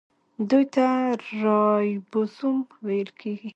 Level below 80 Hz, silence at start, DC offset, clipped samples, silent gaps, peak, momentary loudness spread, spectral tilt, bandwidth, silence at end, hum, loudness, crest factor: -76 dBFS; 0.4 s; under 0.1%; under 0.1%; none; -8 dBFS; 8 LU; -7.5 dB/octave; 8 kHz; 0.05 s; none; -24 LUFS; 16 dB